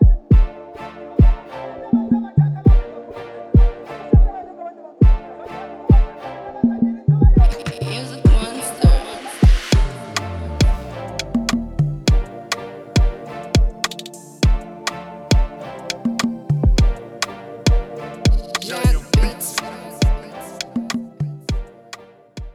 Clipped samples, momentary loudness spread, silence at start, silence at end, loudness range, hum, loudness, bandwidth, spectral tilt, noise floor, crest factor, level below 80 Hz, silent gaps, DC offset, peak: under 0.1%; 16 LU; 0 s; 0.05 s; 4 LU; none; -19 LUFS; 13.5 kHz; -6 dB/octave; -41 dBFS; 16 dB; -20 dBFS; none; under 0.1%; -2 dBFS